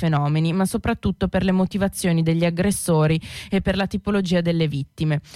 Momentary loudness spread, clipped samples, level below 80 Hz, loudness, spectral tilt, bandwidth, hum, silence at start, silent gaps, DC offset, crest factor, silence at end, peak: 5 LU; under 0.1%; -40 dBFS; -21 LUFS; -6 dB/octave; 15 kHz; none; 0 s; none; under 0.1%; 12 dB; 0 s; -10 dBFS